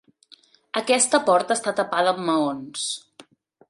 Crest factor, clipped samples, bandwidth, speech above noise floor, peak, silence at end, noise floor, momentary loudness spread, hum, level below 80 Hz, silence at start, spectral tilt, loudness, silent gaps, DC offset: 22 dB; under 0.1%; 11.5 kHz; 33 dB; -2 dBFS; 0.45 s; -55 dBFS; 11 LU; none; -74 dBFS; 0.75 s; -2.5 dB/octave; -22 LUFS; none; under 0.1%